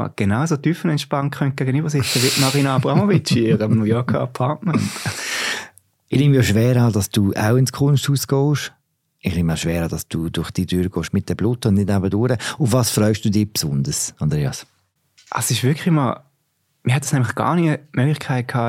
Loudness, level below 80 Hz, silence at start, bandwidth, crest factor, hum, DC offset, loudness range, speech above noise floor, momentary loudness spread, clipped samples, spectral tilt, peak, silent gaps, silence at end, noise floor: -19 LUFS; -46 dBFS; 0 s; 17 kHz; 16 dB; none; under 0.1%; 4 LU; 49 dB; 8 LU; under 0.1%; -5.5 dB/octave; -2 dBFS; none; 0 s; -68 dBFS